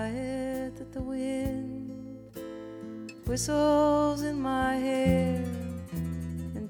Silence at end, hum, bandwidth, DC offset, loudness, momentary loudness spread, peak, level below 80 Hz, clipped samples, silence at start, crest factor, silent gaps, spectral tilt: 0 s; none; over 20 kHz; under 0.1%; -30 LUFS; 17 LU; -10 dBFS; -46 dBFS; under 0.1%; 0 s; 18 dB; none; -6 dB/octave